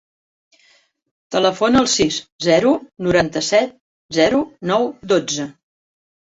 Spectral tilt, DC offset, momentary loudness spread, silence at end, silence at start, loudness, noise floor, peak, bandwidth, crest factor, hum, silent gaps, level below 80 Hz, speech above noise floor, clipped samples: -4 dB/octave; under 0.1%; 9 LU; 0.8 s; 1.3 s; -18 LUFS; -57 dBFS; -2 dBFS; 8 kHz; 18 dB; none; 2.32-2.39 s, 3.81-4.09 s; -50 dBFS; 40 dB; under 0.1%